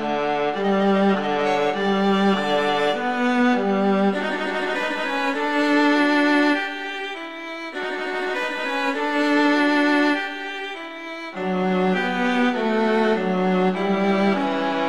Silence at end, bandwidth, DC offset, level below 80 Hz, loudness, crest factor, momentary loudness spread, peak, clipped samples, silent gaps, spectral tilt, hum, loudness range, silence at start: 0 s; 11.5 kHz; 0.6%; -62 dBFS; -21 LUFS; 14 dB; 11 LU; -8 dBFS; under 0.1%; none; -6 dB/octave; none; 2 LU; 0 s